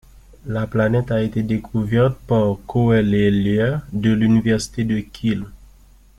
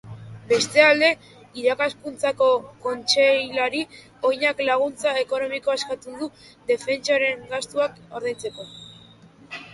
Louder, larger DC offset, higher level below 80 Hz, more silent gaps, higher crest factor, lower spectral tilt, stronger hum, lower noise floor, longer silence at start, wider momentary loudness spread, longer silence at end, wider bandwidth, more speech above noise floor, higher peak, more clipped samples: first, -19 LUFS vs -22 LUFS; neither; first, -42 dBFS vs -64 dBFS; neither; second, 14 dB vs 22 dB; first, -7.5 dB/octave vs -2.5 dB/octave; neither; about the same, -48 dBFS vs -49 dBFS; first, 0.45 s vs 0.05 s; second, 7 LU vs 17 LU; first, 0.6 s vs 0 s; about the same, 12 kHz vs 11.5 kHz; about the same, 30 dB vs 27 dB; about the same, -4 dBFS vs -2 dBFS; neither